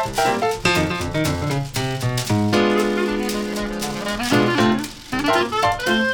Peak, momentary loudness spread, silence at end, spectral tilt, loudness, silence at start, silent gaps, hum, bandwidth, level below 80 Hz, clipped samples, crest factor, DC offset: -4 dBFS; 7 LU; 0 s; -4.5 dB/octave; -20 LUFS; 0 s; none; none; 19.5 kHz; -40 dBFS; under 0.1%; 16 dB; under 0.1%